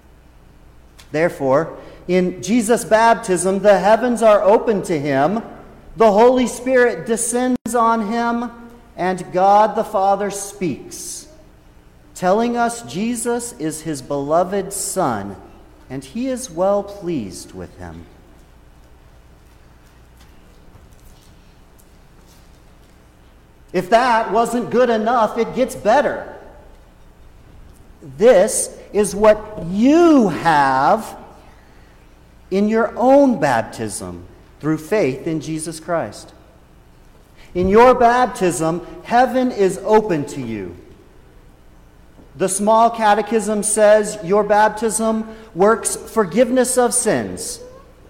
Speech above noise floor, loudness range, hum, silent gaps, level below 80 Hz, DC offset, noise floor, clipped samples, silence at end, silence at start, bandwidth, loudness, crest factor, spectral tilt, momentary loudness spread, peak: 31 dB; 8 LU; none; 7.61-7.65 s; -46 dBFS; under 0.1%; -47 dBFS; under 0.1%; 0.3 s; 1.1 s; 16.5 kHz; -17 LUFS; 16 dB; -4.5 dB/octave; 15 LU; -2 dBFS